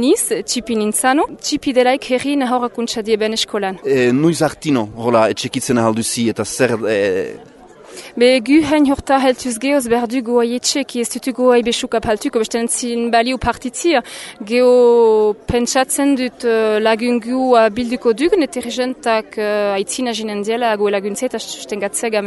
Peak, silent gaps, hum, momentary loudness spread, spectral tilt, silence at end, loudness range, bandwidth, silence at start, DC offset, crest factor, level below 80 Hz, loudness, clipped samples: 0 dBFS; none; none; 7 LU; -4 dB/octave; 0 s; 3 LU; 12 kHz; 0 s; under 0.1%; 16 dB; -46 dBFS; -16 LUFS; under 0.1%